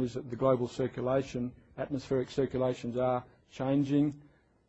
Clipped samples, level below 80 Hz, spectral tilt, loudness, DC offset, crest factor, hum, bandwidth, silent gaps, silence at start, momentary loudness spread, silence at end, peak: under 0.1%; -60 dBFS; -7.5 dB/octave; -32 LUFS; under 0.1%; 18 dB; none; 8.2 kHz; none; 0 s; 9 LU; 0.45 s; -14 dBFS